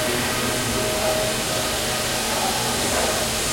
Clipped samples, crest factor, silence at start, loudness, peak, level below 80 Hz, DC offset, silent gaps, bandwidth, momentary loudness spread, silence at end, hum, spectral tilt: under 0.1%; 14 dB; 0 s; -21 LUFS; -8 dBFS; -40 dBFS; under 0.1%; none; 16.5 kHz; 2 LU; 0 s; none; -2.5 dB/octave